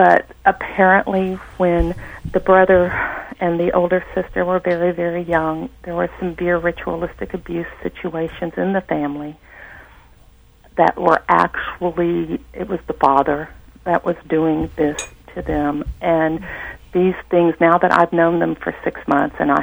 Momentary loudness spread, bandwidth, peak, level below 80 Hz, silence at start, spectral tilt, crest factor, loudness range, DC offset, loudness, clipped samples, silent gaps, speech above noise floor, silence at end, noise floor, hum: 13 LU; over 20 kHz; 0 dBFS; -38 dBFS; 0 s; -7 dB/octave; 18 dB; 6 LU; under 0.1%; -18 LUFS; under 0.1%; none; 30 dB; 0 s; -48 dBFS; none